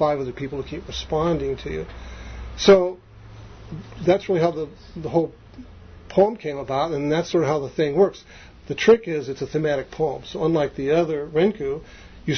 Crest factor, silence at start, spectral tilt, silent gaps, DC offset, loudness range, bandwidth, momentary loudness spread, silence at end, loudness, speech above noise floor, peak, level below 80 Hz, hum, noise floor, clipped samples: 20 dB; 0 s; -6 dB/octave; none; under 0.1%; 2 LU; 6.6 kHz; 19 LU; 0 s; -22 LUFS; 21 dB; -2 dBFS; -44 dBFS; none; -43 dBFS; under 0.1%